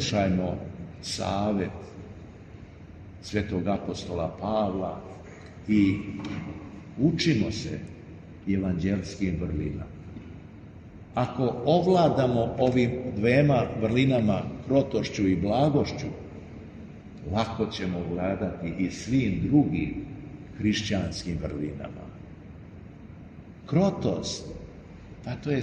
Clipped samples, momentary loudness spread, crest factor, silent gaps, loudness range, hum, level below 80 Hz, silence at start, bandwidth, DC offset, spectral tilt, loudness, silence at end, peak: under 0.1%; 22 LU; 20 dB; none; 8 LU; none; -48 dBFS; 0 s; 9.6 kHz; under 0.1%; -6.5 dB/octave; -27 LUFS; 0 s; -8 dBFS